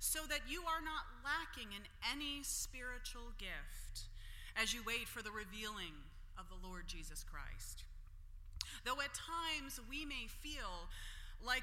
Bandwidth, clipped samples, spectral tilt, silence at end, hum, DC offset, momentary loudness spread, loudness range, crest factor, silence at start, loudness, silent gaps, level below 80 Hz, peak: 16.5 kHz; under 0.1%; -1.5 dB/octave; 0 s; none; under 0.1%; 14 LU; 6 LU; 26 dB; 0 s; -45 LUFS; none; -52 dBFS; -18 dBFS